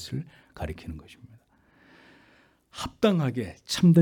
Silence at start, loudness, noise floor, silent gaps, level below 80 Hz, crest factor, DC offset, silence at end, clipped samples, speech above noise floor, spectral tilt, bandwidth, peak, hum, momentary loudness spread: 0 s; -28 LUFS; -61 dBFS; none; -52 dBFS; 18 dB; under 0.1%; 0 s; under 0.1%; 35 dB; -6.5 dB/octave; 14 kHz; -8 dBFS; none; 21 LU